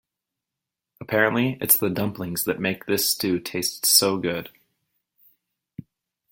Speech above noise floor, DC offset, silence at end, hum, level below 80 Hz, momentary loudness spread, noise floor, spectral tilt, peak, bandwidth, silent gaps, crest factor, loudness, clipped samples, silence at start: 63 dB; under 0.1%; 0.5 s; none; -62 dBFS; 10 LU; -86 dBFS; -3 dB/octave; 0 dBFS; 17 kHz; none; 26 dB; -22 LUFS; under 0.1%; 1 s